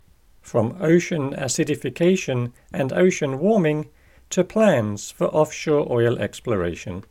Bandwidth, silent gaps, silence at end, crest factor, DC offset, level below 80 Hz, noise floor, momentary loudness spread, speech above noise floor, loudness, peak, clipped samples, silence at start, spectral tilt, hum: 16 kHz; none; 0.1 s; 16 dB; under 0.1%; -52 dBFS; -50 dBFS; 9 LU; 29 dB; -22 LUFS; -4 dBFS; under 0.1%; 0.45 s; -6 dB/octave; none